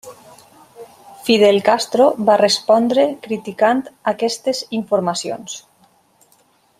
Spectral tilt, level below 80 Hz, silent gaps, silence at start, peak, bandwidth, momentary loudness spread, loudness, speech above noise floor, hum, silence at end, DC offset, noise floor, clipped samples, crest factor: -4 dB/octave; -66 dBFS; none; 0.05 s; -2 dBFS; 15 kHz; 13 LU; -16 LUFS; 40 dB; none; 1.2 s; under 0.1%; -57 dBFS; under 0.1%; 16 dB